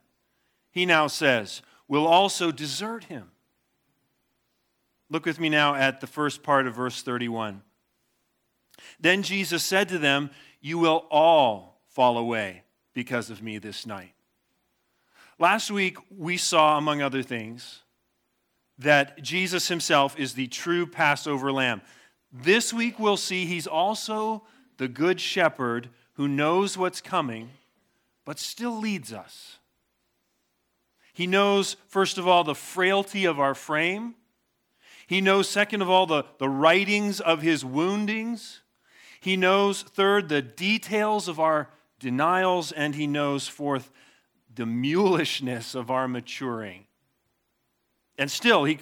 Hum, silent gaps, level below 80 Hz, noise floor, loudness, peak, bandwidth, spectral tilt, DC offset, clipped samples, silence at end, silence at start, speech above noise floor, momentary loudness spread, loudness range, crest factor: none; none; -82 dBFS; -75 dBFS; -24 LUFS; -4 dBFS; 18.5 kHz; -4 dB/octave; under 0.1%; under 0.1%; 0 s; 0.75 s; 50 dB; 15 LU; 6 LU; 22 dB